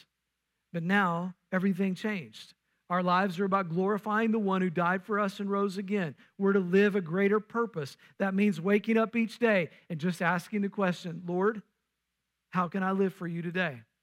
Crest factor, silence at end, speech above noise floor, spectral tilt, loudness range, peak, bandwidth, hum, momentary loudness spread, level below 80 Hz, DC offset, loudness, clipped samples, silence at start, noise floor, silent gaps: 16 dB; 0.2 s; 55 dB; -7 dB/octave; 4 LU; -14 dBFS; 14 kHz; none; 9 LU; -80 dBFS; under 0.1%; -30 LUFS; under 0.1%; 0.75 s; -84 dBFS; none